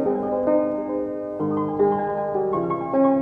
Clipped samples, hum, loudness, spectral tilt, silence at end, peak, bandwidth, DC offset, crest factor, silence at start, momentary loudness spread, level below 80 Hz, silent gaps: under 0.1%; none; -23 LUFS; -11 dB/octave; 0 s; -8 dBFS; 3.6 kHz; under 0.1%; 14 dB; 0 s; 6 LU; -56 dBFS; none